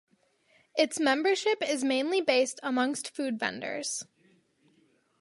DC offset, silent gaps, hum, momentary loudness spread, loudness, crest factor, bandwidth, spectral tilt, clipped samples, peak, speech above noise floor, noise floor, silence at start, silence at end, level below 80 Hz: under 0.1%; none; none; 9 LU; -29 LUFS; 20 dB; 11.5 kHz; -2 dB/octave; under 0.1%; -10 dBFS; 39 dB; -68 dBFS; 0.75 s; 1.2 s; -80 dBFS